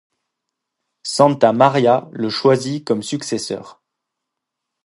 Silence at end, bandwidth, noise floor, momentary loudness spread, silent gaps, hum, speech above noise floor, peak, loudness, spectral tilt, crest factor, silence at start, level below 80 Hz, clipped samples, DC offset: 1.15 s; 11.5 kHz; -80 dBFS; 12 LU; none; none; 64 dB; 0 dBFS; -17 LUFS; -5 dB/octave; 18 dB; 1.05 s; -66 dBFS; under 0.1%; under 0.1%